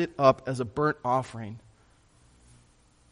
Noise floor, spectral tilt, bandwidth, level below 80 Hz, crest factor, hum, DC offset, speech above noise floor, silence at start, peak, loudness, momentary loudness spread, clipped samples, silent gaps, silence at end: -61 dBFS; -6.5 dB/octave; 10.5 kHz; -60 dBFS; 24 dB; none; under 0.1%; 34 dB; 0 s; -6 dBFS; -27 LUFS; 18 LU; under 0.1%; none; 1.55 s